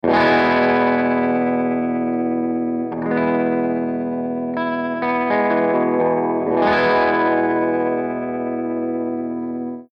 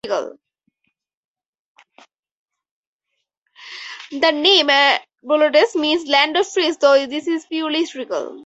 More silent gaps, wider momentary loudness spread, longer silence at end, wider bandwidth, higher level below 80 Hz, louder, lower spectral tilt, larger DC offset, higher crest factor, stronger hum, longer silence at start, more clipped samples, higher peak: second, none vs 1.17-1.35 s, 1.46-1.53 s, 1.59-1.75 s, 2.19-2.23 s, 2.32-2.46 s, 2.71-2.99 s, 3.37-3.42 s; second, 8 LU vs 18 LU; about the same, 0.1 s vs 0 s; second, 5.8 kHz vs 8.2 kHz; first, -58 dBFS vs -70 dBFS; second, -19 LUFS vs -16 LUFS; first, -8 dB/octave vs -1.5 dB/octave; neither; about the same, 14 dB vs 18 dB; neither; about the same, 0.05 s vs 0.05 s; neither; second, -6 dBFS vs -2 dBFS